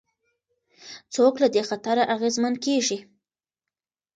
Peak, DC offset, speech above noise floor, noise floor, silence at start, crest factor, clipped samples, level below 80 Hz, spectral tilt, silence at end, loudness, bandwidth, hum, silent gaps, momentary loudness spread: -6 dBFS; under 0.1%; 67 dB; -89 dBFS; 0.8 s; 18 dB; under 0.1%; -74 dBFS; -3 dB/octave; 1.15 s; -23 LUFS; 9.4 kHz; none; none; 13 LU